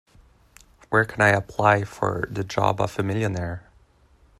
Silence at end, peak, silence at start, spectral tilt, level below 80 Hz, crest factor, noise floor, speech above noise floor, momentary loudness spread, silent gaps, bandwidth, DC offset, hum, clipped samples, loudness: 0.8 s; -2 dBFS; 0.9 s; -6 dB/octave; -52 dBFS; 22 dB; -57 dBFS; 35 dB; 10 LU; none; 13.5 kHz; under 0.1%; none; under 0.1%; -23 LUFS